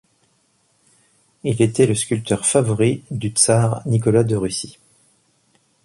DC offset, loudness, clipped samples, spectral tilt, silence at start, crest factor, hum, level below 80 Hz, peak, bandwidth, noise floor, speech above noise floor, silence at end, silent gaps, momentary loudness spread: under 0.1%; -18 LUFS; under 0.1%; -5 dB/octave; 1.45 s; 18 dB; none; -50 dBFS; -2 dBFS; 11.5 kHz; -63 dBFS; 45 dB; 1.15 s; none; 10 LU